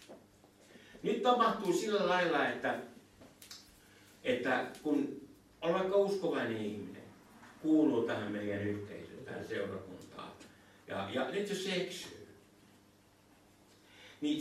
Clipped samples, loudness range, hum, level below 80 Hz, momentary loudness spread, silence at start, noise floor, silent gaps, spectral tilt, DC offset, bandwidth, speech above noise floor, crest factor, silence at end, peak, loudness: under 0.1%; 7 LU; none; -74 dBFS; 21 LU; 0 s; -65 dBFS; none; -5 dB/octave; under 0.1%; 14.5 kHz; 31 dB; 20 dB; 0 s; -16 dBFS; -35 LUFS